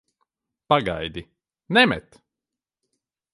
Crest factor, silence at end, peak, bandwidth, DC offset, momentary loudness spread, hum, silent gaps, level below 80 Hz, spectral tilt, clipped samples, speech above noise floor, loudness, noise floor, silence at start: 24 dB; 1.35 s; -2 dBFS; 11.5 kHz; under 0.1%; 15 LU; none; none; -52 dBFS; -5.5 dB/octave; under 0.1%; 67 dB; -21 LUFS; -88 dBFS; 0.7 s